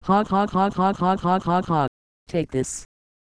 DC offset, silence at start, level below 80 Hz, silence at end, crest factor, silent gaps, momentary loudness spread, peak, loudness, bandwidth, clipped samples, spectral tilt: under 0.1%; 0.05 s; -48 dBFS; 0.35 s; 14 dB; 1.88-2.26 s; 8 LU; -8 dBFS; -23 LUFS; 11 kHz; under 0.1%; -6 dB/octave